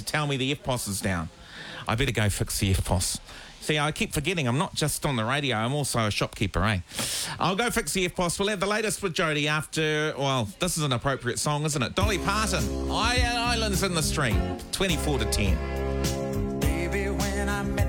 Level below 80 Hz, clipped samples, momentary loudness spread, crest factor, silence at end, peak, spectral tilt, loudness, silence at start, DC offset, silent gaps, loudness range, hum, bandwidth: -36 dBFS; under 0.1%; 4 LU; 16 dB; 0 s; -10 dBFS; -4 dB/octave; -26 LUFS; 0 s; under 0.1%; none; 2 LU; none; 19 kHz